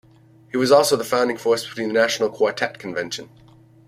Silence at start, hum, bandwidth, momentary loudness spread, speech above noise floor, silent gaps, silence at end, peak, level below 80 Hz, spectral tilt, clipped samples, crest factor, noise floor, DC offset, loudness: 0.55 s; none; 16 kHz; 13 LU; 31 dB; none; 0.6 s; -2 dBFS; -64 dBFS; -3.5 dB/octave; under 0.1%; 20 dB; -51 dBFS; under 0.1%; -20 LUFS